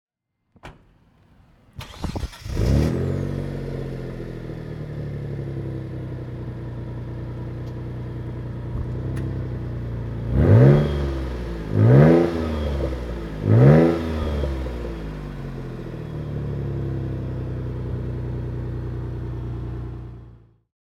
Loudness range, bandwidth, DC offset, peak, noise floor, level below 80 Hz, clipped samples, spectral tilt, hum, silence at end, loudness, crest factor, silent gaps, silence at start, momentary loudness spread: 13 LU; 12 kHz; under 0.1%; -2 dBFS; -68 dBFS; -34 dBFS; under 0.1%; -9 dB/octave; none; 0.5 s; -23 LUFS; 22 dB; none; 0.65 s; 18 LU